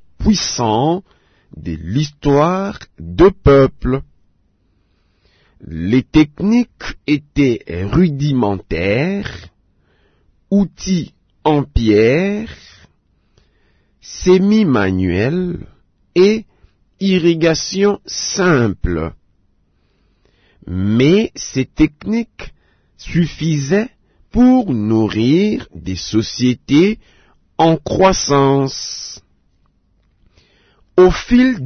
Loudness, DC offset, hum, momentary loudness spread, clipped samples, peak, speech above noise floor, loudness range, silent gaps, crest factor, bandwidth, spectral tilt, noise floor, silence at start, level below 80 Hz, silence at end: -15 LUFS; under 0.1%; none; 14 LU; under 0.1%; -2 dBFS; 45 dB; 3 LU; none; 14 dB; 6.6 kHz; -6 dB/octave; -59 dBFS; 0.2 s; -34 dBFS; 0 s